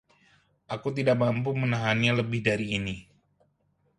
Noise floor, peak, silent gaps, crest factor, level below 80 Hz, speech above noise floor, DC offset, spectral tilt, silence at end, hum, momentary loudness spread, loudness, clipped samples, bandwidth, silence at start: -70 dBFS; -8 dBFS; none; 20 dB; -58 dBFS; 44 dB; under 0.1%; -6.5 dB/octave; 0.95 s; none; 11 LU; -27 LUFS; under 0.1%; 11 kHz; 0.7 s